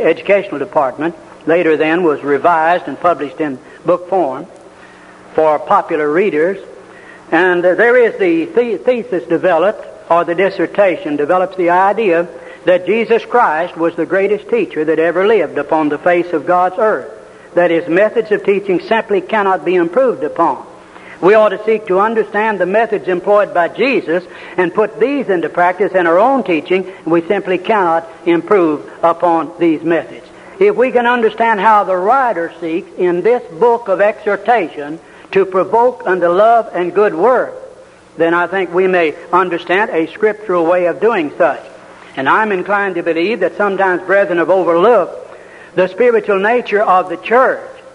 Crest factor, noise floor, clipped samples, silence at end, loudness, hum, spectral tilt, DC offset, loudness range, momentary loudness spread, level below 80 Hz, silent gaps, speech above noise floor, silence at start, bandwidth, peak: 14 dB; -39 dBFS; under 0.1%; 0.05 s; -13 LUFS; none; -6.5 dB/octave; under 0.1%; 2 LU; 6 LU; -58 dBFS; none; 26 dB; 0 s; 10.5 kHz; 0 dBFS